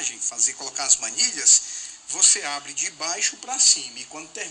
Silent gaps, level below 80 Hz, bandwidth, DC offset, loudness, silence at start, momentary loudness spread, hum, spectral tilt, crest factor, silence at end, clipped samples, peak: none; -66 dBFS; 10 kHz; under 0.1%; -19 LUFS; 0 s; 17 LU; none; 2.5 dB/octave; 18 dB; 0 s; under 0.1%; -4 dBFS